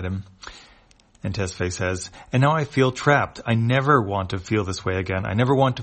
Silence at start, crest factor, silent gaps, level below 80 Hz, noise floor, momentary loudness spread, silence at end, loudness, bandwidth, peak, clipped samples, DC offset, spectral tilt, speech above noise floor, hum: 0 s; 20 dB; none; -50 dBFS; -55 dBFS; 12 LU; 0 s; -22 LUFS; 8.8 kHz; -2 dBFS; under 0.1%; under 0.1%; -6 dB/octave; 33 dB; none